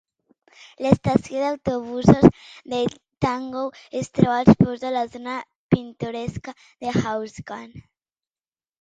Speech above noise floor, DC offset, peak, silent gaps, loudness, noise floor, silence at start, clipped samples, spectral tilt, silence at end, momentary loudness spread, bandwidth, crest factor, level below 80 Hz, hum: over 69 dB; under 0.1%; 0 dBFS; 5.56-5.69 s; -22 LUFS; under -90 dBFS; 0.8 s; under 0.1%; -7.5 dB/octave; 1 s; 17 LU; 9.2 kHz; 22 dB; -46 dBFS; none